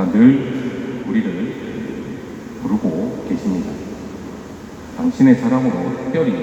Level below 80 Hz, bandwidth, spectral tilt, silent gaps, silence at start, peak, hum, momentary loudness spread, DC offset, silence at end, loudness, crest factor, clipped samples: -48 dBFS; 8.2 kHz; -8 dB/octave; none; 0 s; 0 dBFS; none; 19 LU; under 0.1%; 0 s; -19 LUFS; 18 dB; under 0.1%